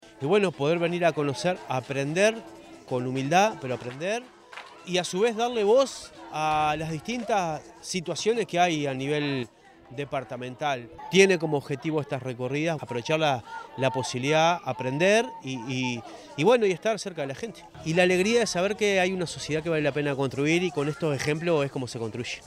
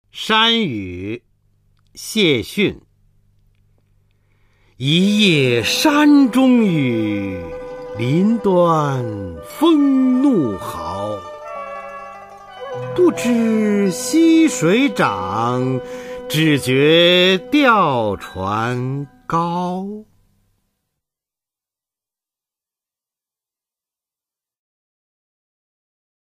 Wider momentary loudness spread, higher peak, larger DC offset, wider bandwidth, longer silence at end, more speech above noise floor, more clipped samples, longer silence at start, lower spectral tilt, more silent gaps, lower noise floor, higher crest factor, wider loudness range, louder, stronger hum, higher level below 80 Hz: second, 11 LU vs 18 LU; about the same, -4 dBFS vs -2 dBFS; neither; about the same, 15 kHz vs 15.5 kHz; second, 0 s vs 6.25 s; second, 19 dB vs 74 dB; neither; about the same, 0.05 s vs 0.15 s; about the same, -4.5 dB/octave vs -5 dB/octave; neither; second, -45 dBFS vs -90 dBFS; first, 22 dB vs 16 dB; second, 3 LU vs 8 LU; second, -26 LUFS vs -16 LUFS; neither; second, -62 dBFS vs -52 dBFS